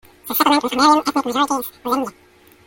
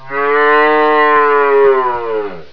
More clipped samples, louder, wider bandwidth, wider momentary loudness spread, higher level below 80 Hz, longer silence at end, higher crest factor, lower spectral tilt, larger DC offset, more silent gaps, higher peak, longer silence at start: neither; second, -18 LUFS vs -11 LUFS; first, 17 kHz vs 5.4 kHz; about the same, 9 LU vs 9 LU; about the same, -56 dBFS vs -54 dBFS; first, 0.55 s vs 0 s; about the same, 16 dB vs 12 dB; second, -2.5 dB/octave vs -6 dB/octave; second, under 0.1% vs 3%; neither; about the same, -2 dBFS vs 0 dBFS; first, 0.25 s vs 0 s